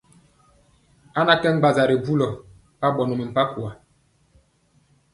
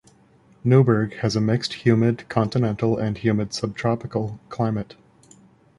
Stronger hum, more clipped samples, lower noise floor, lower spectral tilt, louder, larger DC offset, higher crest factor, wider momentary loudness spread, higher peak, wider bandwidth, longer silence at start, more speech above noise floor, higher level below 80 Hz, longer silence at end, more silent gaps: neither; neither; first, -62 dBFS vs -55 dBFS; about the same, -6.5 dB/octave vs -7 dB/octave; about the same, -21 LUFS vs -22 LUFS; neither; about the same, 22 dB vs 18 dB; first, 13 LU vs 10 LU; about the same, -2 dBFS vs -4 dBFS; about the same, 11.5 kHz vs 11 kHz; first, 1.15 s vs 0.65 s; first, 42 dB vs 34 dB; second, -58 dBFS vs -52 dBFS; first, 1.4 s vs 0.95 s; neither